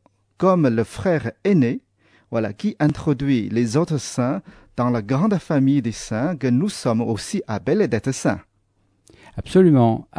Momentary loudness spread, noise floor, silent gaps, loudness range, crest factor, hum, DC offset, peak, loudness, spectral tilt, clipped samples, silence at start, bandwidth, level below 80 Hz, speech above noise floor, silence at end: 9 LU; -64 dBFS; none; 2 LU; 16 dB; none; under 0.1%; -4 dBFS; -20 LUFS; -7 dB/octave; under 0.1%; 0.4 s; 11 kHz; -50 dBFS; 45 dB; 0.15 s